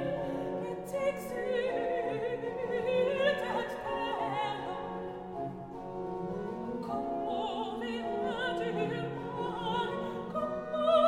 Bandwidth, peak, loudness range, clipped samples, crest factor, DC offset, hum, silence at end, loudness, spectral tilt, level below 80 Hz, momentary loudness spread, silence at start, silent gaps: 16 kHz; -14 dBFS; 5 LU; under 0.1%; 18 dB; under 0.1%; none; 0 s; -34 LUFS; -6 dB/octave; -60 dBFS; 9 LU; 0 s; none